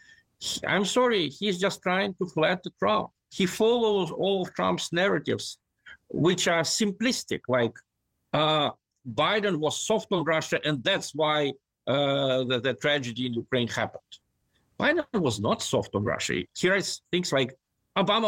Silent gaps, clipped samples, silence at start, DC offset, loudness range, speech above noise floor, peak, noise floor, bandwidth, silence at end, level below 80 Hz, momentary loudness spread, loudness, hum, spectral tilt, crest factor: none; under 0.1%; 0.4 s; under 0.1%; 2 LU; 46 dB; -12 dBFS; -72 dBFS; 16.5 kHz; 0 s; -64 dBFS; 8 LU; -26 LUFS; none; -4 dB/octave; 14 dB